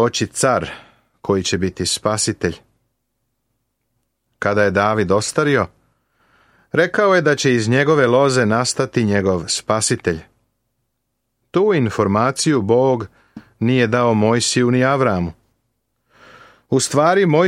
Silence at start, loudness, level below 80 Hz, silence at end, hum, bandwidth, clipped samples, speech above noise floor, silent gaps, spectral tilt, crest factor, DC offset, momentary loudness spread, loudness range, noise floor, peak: 0 s; -17 LUFS; -52 dBFS; 0 s; none; 15 kHz; under 0.1%; 57 dB; none; -4.5 dB/octave; 16 dB; under 0.1%; 9 LU; 5 LU; -73 dBFS; -2 dBFS